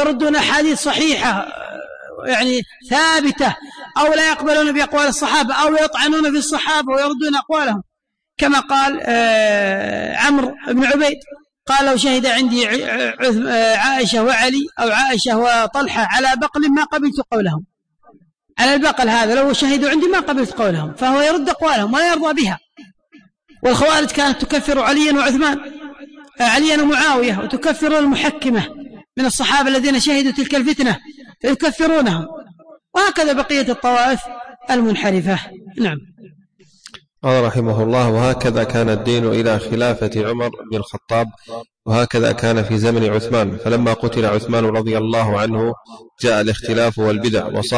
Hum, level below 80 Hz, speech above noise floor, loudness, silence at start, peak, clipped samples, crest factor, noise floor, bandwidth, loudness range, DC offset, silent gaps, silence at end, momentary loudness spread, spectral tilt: none; -44 dBFS; 62 dB; -16 LUFS; 0 s; -4 dBFS; under 0.1%; 12 dB; -78 dBFS; 10.5 kHz; 3 LU; under 0.1%; none; 0 s; 9 LU; -4.5 dB/octave